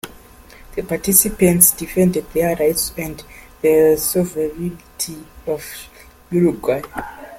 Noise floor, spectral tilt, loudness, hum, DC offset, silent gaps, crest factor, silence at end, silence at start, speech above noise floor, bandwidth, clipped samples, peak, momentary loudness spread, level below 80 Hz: -43 dBFS; -4.5 dB/octave; -17 LUFS; none; under 0.1%; none; 18 dB; 0 s; 0.05 s; 25 dB; 17 kHz; under 0.1%; 0 dBFS; 18 LU; -42 dBFS